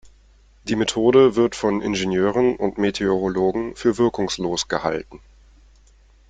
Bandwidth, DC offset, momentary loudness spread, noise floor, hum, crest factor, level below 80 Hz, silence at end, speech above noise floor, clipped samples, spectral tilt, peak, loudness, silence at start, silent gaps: 9.2 kHz; under 0.1%; 9 LU; -52 dBFS; none; 18 dB; -48 dBFS; 1.15 s; 33 dB; under 0.1%; -5 dB/octave; -4 dBFS; -20 LUFS; 0.05 s; none